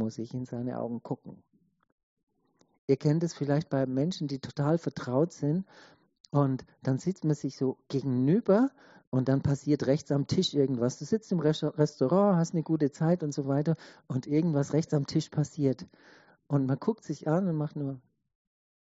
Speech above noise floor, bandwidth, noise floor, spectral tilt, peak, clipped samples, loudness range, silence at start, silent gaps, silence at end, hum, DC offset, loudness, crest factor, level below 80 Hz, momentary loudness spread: 41 dB; 8 kHz; -70 dBFS; -7.5 dB/octave; -10 dBFS; under 0.1%; 5 LU; 0 s; 1.92-2.17 s, 2.23-2.27 s, 2.78-2.88 s, 6.20-6.24 s, 9.07-9.12 s; 0.95 s; none; under 0.1%; -29 LUFS; 18 dB; -66 dBFS; 9 LU